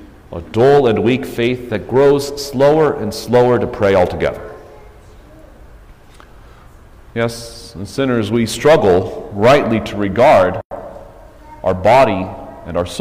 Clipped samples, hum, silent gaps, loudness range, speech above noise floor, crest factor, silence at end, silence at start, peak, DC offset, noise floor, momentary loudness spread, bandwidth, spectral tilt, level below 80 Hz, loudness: under 0.1%; none; 10.65-10.70 s; 12 LU; 27 dB; 14 dB; 0 s; 0 s; -2 dBFS; under 0.1%; -41 dBFS; 19 LU; 16 kHz; -6 dB/octave; -40 dBFS; -14 LUFS